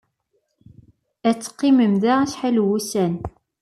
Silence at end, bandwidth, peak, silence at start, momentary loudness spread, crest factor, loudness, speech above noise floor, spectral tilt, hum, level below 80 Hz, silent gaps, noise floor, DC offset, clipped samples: 0.3 s; 14 kHz; -6 dBFS; 1.25 s; 8 LU; 16 dB; -20 LUFS; 52 dB; -6 dB/octave; none; -54 dBFS; none; -71 dBFS; under 0.1%; under 0.1%